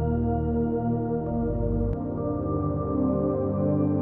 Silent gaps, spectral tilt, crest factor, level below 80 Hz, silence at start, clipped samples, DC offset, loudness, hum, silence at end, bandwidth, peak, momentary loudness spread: none; -13 dB/octave; 12 dB; -38 dBFS; 0 s; under 0.1%; under 0.1%; -27 LUFS; none; 0 s; 3 kHz; -12 dBFS; 3 LU